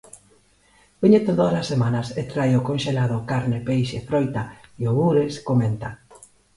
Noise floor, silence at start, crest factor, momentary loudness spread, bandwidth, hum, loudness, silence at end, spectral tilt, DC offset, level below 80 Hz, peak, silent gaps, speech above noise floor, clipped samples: -58 dBFS; 1 s; 18 dB; 10 LU; 11.5 kHz; none; -22 LUFS; 0.6 s; -7.5 dB/octave; under 0.1%; -52 dBFS; -4 dBFS; none; 37 dB; under 0.1%